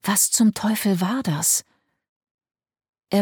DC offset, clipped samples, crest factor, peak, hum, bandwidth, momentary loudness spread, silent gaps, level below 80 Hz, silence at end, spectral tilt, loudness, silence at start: under 0.1%; under 0.1%; 16 dB; -6 dBFS; none; 19 kHz; 6 LU; 2.09-2.21 s, 2.31-2.38 s, 2.89-2.93 s; -64 dBFS; 0 s; -3.5 dB/octave; -20 LUFS; 0.05 s